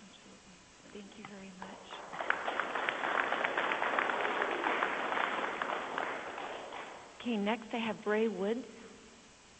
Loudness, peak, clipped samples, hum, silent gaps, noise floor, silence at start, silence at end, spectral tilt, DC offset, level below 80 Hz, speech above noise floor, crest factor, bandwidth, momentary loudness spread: -35 LUFS; -12 dBFS; under 0.1%; none; none; -58 dBFS; 0 s; 0 s; -4 dB/octave; under 0.1%; -74 dBFS; 22 dB; 24 dB; 8.4 kHz; 20 LU